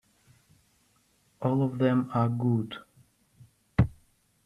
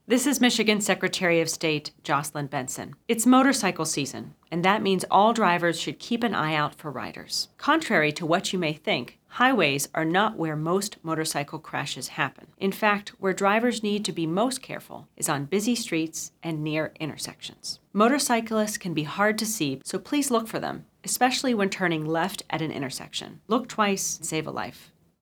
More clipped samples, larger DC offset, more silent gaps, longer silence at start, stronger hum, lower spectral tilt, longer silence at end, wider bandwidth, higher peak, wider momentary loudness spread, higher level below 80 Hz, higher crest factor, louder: neither; neither; neither; first, 1.4 s vs 0.1 s; neither; first, -9 dB/octave vs -3.5 dB/octave; first, 0.55 s vs 0.4 s; second, 10.5 kHz vs over 20 kHz; second, -8 dBFS vs -4 dBFS; second, 8 LU vs 12 LU; first, -50 dBFS vs -68 dBFS; about the same, 22 dB vs 22 dB; second, -28 LUFS vs -25 LUFS